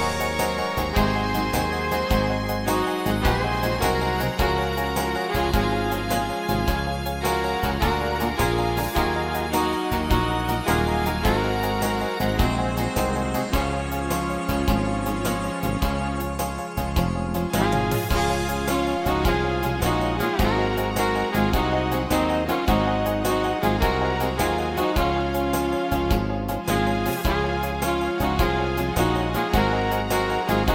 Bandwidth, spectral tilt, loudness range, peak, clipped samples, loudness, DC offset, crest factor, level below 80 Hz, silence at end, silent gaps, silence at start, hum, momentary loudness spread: 17 kHz; -5.5 dB/octave; 2 LU; -6 dBFS; under 0.1%; -23 LUFS; under 0.1%; 16 dB; -32 dBFS; 0 s; none; 0 s; none; 3 LU